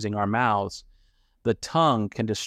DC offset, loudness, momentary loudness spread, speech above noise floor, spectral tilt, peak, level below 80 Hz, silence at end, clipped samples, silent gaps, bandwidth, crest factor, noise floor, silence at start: under 0.1%; -25 LUFS; 10 LU; 38 dB; -5.5 dB/octave; -8 dBFS; -58 dBFS; 0 s; under 0.1%; none; 14.5 kHz; 16 dB; -62 dBFS; 0 s